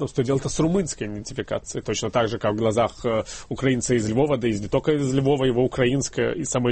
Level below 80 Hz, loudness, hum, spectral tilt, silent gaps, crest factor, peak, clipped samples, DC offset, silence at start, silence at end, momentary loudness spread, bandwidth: -44 dBFS; -23 LUFS; none; -5.5 dB/octave; none; 16 dB; -6 dBFS; under 0.1%; under 0.1%; 0 s; 0 s; 8 LU; 8.8 kHz